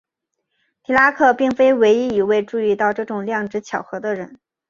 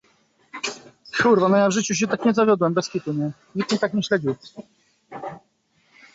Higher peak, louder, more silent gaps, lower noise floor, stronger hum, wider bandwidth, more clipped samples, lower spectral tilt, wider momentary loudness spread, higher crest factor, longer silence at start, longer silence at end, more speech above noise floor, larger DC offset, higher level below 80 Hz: first, -2 dBFS vs -6 dBFS; first, -18 LUFS vs -21 LUFS; neither; first, -77 dBFS vs -65 dBFS; neither; about the same, 7.4 kHz vs 8 kHz; neither; about the same, -5.5 dB/octave vs -5 dB/octave; second, 12 LU vs 19 LU; about the same, 18 dB vs 18 dB; first, 0.9 s vs 0.55 s; second, 0.35 s vs 0.75 s; first, 60 dB vs 44 dB; neither; first, -58 dBFS vs -64 dBFS